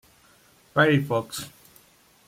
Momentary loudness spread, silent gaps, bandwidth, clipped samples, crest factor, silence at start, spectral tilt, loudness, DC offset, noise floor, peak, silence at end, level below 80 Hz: 15 LU; none; 16.5 kHz; under 0.1%; 20 dB; 0.75 s; -5.5 dB/octave; -24 LUFS; under 0.1%; -58 dBFS; -8 dBFS; 0.8 s; -64 dBFS